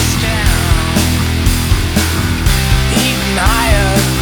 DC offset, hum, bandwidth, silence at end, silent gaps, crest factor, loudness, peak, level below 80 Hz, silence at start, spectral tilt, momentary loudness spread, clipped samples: under 0.1%; none; over 20 kHz; 0 s; none; 12 dB; -13 LUFS; 0 dBFS; -16 dBFS; 0 s; -4 dB/octave; 2 LU; under 0.1%